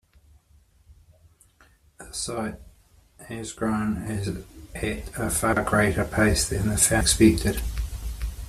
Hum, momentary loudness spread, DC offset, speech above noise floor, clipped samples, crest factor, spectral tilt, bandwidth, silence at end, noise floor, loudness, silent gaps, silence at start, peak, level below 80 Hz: none; 17 LU; under 0.1%; 35 dB; under 0.1%; 22 dB; -4 dB/octave; 15.5 kHz; 0 s; -59 dBFS; -24 LUFS; none; 0.9 s; -4 dBFS; -36 dBFS